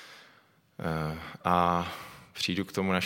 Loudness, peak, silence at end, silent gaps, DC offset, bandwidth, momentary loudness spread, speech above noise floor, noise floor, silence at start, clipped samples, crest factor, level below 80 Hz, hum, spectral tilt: -30 LUFS; -8 dBFS; 0 s; none; under 0.1%; 16.5 kHz; 16 LU; 33 dB; -62 dBFS; 0 s; under 0.1%; 22 dB; -60 dBFS; none; -5 dB/octave